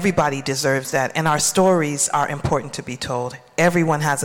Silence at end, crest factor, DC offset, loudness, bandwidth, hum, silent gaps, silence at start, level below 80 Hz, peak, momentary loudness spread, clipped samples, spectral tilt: 0 s; 14 dB; under 0.1%; -20 LUFS; 17 kHz; none; none; 0 s; -48 dBFS; -6 dBFS; 9 LU; under 0.1%; -4 dB/octave